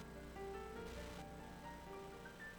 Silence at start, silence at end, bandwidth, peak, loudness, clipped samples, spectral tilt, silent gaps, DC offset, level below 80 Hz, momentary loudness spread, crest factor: 0 s; 0 s; over 20 kHz; -38 dBFS; -52 LUFS; under 0.1%; -5 dB/octave; none; under 0.1%; -60 dBFS; 4 LU; 14 dB